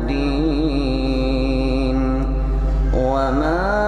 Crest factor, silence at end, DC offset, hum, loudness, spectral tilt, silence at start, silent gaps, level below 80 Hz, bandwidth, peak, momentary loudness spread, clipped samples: 12 dB; 0 s; under 0.1%; none; -20 LUFS; -7.5 dB/octave; 0 s; none; -22 dBFS; 7.4 kHz; -6 dBFS; 3 LU; under 0.1%